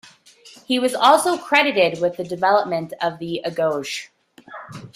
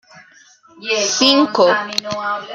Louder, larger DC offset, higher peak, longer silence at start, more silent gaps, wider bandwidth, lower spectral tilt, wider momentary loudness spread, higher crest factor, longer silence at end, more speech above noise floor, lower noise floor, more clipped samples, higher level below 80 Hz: second, -19 LUFS vs -15 LUFS; neither; about the same, -2 dBFS vs -2 dBFS; first, 0.45 s vs 0.15 s; neither; about the same, 16 kHz vs 15 kHz; first, -3.5 dB/octave vs -2 dB/octave; first, 16 LU vs 10 LU; about the same, 20 dB vs 16 dB; about the same, 0.1 s vs 0 s; second, 28 dB vs 32 dB; about the same, -48 dBFS vs -48 dBFS; neither; about the same, -66 dBFS vs -62 dBFS